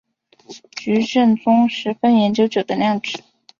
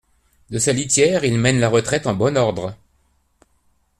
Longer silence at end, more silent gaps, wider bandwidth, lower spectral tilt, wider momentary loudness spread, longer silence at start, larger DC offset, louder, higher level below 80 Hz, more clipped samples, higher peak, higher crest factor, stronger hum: second, 0.4 s vs 1.25 s; neither; second, 7.2 kHz vs 14 kHz; first, -6 dB/octave vs -4.5 dB/octave; first, 13 LU vs 10 LU; about the same, 0.5 s vs 0.5 s; neither; about the same, -17 LUFS vs -18 LUFS; second, -62 dBFS vs -50 dBFS; neither; about the same, -4 dBFS vs -2 dBFS; about the same, 14 dB vs 18 dB; neither